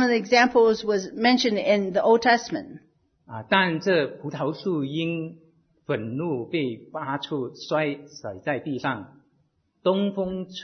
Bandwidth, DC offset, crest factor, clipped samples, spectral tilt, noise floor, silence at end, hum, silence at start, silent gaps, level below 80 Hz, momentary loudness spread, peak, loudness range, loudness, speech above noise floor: 6.6 kHz; under 0.1%; 18 dB; under 0.1%; -5 dB/octave; -68 dBFS; 0 s; none; 0 s; none; -64 dBFS; 14 LU; -6 dBFS; 8 LU; -24 LUFS; 44 dB